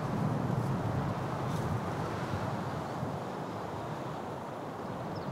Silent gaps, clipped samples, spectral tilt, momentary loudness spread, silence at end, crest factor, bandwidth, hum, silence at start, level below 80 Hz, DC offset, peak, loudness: none; under 0.1%; -7 dB/octave; 7 LU; 0 s; 16 dB; 16 kHz; none; 0 s; -58 dBFS; under 0.1%; -20 dBFS; -36 LUFS